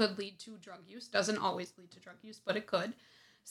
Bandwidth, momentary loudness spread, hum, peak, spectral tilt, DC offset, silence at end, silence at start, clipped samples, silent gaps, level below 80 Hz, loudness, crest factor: 14.5 kHz; 20 LU; none; -16 dBFS; -3.5 dB/octave; under 0.1%; 0 s; 0 s; under 0.1%; none; -84 dBFS; -36 LUFS; 22 dB